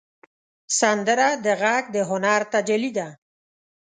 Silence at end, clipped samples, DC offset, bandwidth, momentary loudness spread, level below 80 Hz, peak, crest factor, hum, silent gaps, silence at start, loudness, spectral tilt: 0.85 s; under 0.1%; under 0.1%; 9.6 kHz; 7 LU; -74 dBFS; -4 dBFS; 18 dB; none; none; 0.7 s; -21 LUFS; -3 dB/octave